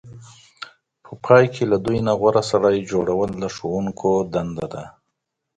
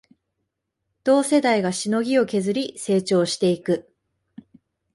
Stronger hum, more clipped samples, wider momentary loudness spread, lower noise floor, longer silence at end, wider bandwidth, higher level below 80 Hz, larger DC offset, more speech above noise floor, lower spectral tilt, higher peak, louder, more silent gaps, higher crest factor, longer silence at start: neither; neither; first, 20 LU vs 8 LU; about the same, -78 dBFS vs -78 dBFS; second, 0.7 s vs 1.15 s; second, 9.2 kHz vs 11.5 kHz; first, -50 dBFS vs -66 dBFS; neither; about the same, 58 dB vs 58 dB; first, -6.5 dB/octave vs -5 dB/octave; first, 0 dBFS vs -6 dBFS; about the same, -20 LUFS vs -21 LUFS; neither; about the same, 20 dB vs 16 dB; second, 0.05 s vs 1.05 s